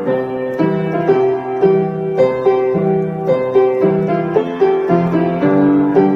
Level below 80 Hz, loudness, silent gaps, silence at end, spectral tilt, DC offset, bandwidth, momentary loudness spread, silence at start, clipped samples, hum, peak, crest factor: -52 dBFS; -15 LUFS; none; 0 s; -9.5 dB/octave; under 0.1%; 5.6 kHz; 5 LU; 0 s; under 0.1%; none; 0 dBFS; 12 dB